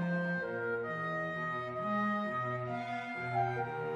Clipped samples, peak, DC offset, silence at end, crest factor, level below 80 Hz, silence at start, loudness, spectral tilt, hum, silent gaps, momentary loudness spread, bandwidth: under 0.1%; -20 dBFS; under 0.1%; 0 s; 16 dB; -74 dBFS; 0 s; -36 LUFS; -7.5 dB/octave; none; none; 4 LU; 8.6 kHz